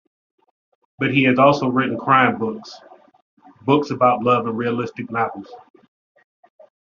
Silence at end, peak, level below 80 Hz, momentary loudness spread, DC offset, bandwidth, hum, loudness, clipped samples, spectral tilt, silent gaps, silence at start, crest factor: 1.4 s; -2 dBFS; -62 dBFS; 12 LU; under 0.1%; 7.2 kHz; none; -18 LUFS; under 0.1%; -4.5 dB/octave; 3.22-3.37 s; 1 s; 20 dB